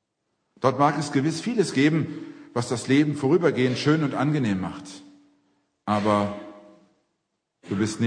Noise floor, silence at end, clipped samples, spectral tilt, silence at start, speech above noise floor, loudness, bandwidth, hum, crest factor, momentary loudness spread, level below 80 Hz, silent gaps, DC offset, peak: -78 dBFS; 0 s; under 0.1%; -6 dB/octave; 0.6 s; 55 dB; -24 LUFS; 10 kHz; none; 20 dB; 17 LU; -66 dBFS; none; under 0.1%; -6 dBFS